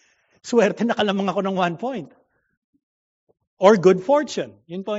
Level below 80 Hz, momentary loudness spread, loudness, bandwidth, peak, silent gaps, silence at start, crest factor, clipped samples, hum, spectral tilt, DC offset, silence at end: -70 dBFS; 16 LU; -20 LUFS; 8 kHz; 0 dBFS; 2.57-2.73 s, 2.83-3.27 s, 3.47-3.57 s; 0.45 s; 20 dB; under 0.1%; none; -4.5 dB/octave; under 0.1%; 0 s